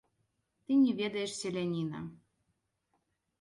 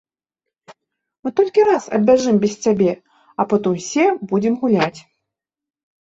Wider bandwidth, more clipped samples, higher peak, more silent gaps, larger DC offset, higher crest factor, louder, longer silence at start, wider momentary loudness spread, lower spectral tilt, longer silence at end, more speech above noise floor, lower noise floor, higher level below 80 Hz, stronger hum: first, 11.5 kHz vs 8 kHz; neither; second, -18 dBFS vs -2 dBFS; neither; neither; about the same, 16 dB vs 16 dB; second, -32 LUFS vs -17 LUFS; second, 0.7 s vs 1.25 s; first, 14 LU vs 9 LU; about the same, -5.5 dB/octave vs -6 dB/octave; about the same, 1.25 s vs 1.15 s; second, 49 dB vs 71 dB; second, -81 dBFS vs -88 dBFS; second, -74 dBFS vs -60 dBFS; neither